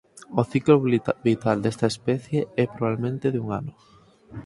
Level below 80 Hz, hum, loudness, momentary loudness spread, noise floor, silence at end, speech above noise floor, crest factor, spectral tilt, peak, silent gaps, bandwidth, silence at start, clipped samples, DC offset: -58 dBFS; none; -24 LUFS; 11 LU; -42 dBFS; 0.05 s; 19 dB; 20 dB; -7.5 dB/octave; -4 dBFS; none; 11.5 kHz; 0.15 s; under 0.1%; under 0.1%